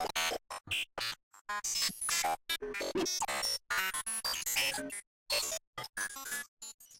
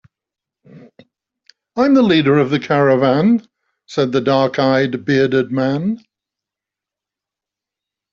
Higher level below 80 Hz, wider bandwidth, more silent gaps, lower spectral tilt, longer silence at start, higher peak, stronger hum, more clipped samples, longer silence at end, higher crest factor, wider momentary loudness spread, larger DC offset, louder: second, -64 dBFS vs -58 dBFS; first, 17 kHz vs 7.2 kHz; first, 1.23-1.31 s, 1.41-1.45 s, 5.07-5.26 s, 5.67-5.73 s, 5.89-5.93 s, 6.48-6.57 s, 6.74-6.78 s vs none; second, 0 dB/octave vs -7 dB/octave; second, 0 s vs 0.75 s; second, -20 dBFS vs -2 dBFS; neither; neither; second, 0 s vs 2.15 s; about the same, 16 dB vs 16 dB; about the same, 10 LU vs 8 LU; neither; second, -34 LUFS vs -15 LUFS